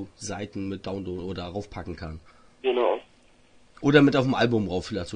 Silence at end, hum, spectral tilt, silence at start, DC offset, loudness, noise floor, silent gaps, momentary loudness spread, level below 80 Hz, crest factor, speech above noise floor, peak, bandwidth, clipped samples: 0 s; none; -6 dB/octave; 0 s; under 0.1%; -26 LUFS; -57 dBFS; none; 18 LU; -54 dBFS; 22 dB; 32 dB; -4 dBFS; 10 kHz; under 0.1%